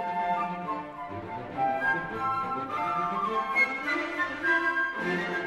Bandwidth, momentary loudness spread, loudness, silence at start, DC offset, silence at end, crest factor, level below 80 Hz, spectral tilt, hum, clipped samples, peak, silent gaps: 15.5 kHz; 11 LU; -29 LUFS; 0 s; under 0.1%; 0 s; 16 dB; -60 dBFS; -5.5 dB/octave; none; under 0.1%; -14 dBFS; none